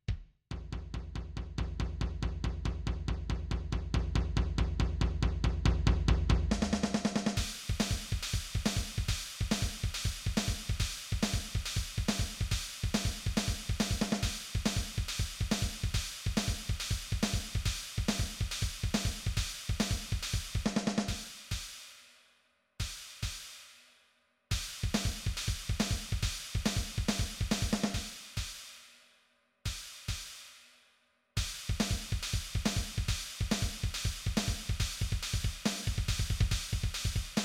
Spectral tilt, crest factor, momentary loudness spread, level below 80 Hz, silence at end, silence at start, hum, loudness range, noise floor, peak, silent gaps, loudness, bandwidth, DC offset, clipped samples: -4 dB/octave; 20 dB; 8 LU; -38 dBFS; 0 s; 0.1 s; none; 7 LU; -71 dBFS; -14 dBFS; none; -35 LUFS; 16.5 kHz; under 0.1%; under 0.1%